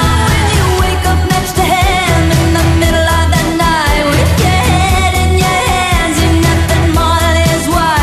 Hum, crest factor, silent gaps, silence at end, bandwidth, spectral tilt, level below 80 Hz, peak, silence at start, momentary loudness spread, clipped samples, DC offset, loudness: none; 10 dB; none; 0 s; 14 kHz; -4.5 dB/octave; -18 dBFS; 0 dBFS; 0 s; 2 LU; under 0.1%; under 0.1%; -11 LUFS